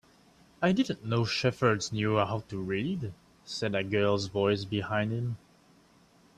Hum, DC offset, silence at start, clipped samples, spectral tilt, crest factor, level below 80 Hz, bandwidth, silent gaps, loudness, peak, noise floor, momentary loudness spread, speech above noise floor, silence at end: none; under 0.1%; 0.6 s; under 0.1%; -5.5 dB/octave; 18 dB; -62 dBFS; 12 kHz; none; -30 LUFS; -12 dBFS; -61 dBFS; 8 LU; 32 dB; 1 s